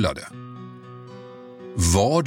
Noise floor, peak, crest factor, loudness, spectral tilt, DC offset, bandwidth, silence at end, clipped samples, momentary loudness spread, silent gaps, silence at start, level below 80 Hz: -41 dBFS; -6 dBFS; 20 dB; -22 LUFS; -5 dB/octave; under 0.1%; 16.5 kHz; 0 s; under 0.1%; 22 LU; none; 0 s; -38 dBFS